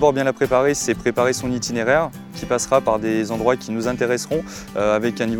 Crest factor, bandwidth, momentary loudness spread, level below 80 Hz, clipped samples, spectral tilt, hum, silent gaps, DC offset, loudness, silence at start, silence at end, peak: 18 dB; 19 kHz; 6 LU; -46 dBFS; under 0.1%; -4.5 dB/octave; none; none; under 0.1%; -20 LUFS; 0 s; 0 s; -2 dBFS